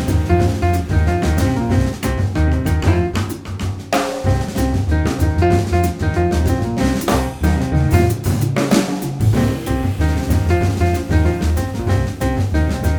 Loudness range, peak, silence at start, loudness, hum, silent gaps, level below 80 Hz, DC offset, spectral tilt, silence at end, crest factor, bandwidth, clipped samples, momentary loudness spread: 2 LU; 0 dBFS; 0 s; -18 LUFS; none; none; -24 dBFS; under 0.1%; -6.5 dB/octave; 0 s; 16 dB; over 20 kHz; under 0.1%; 4 LU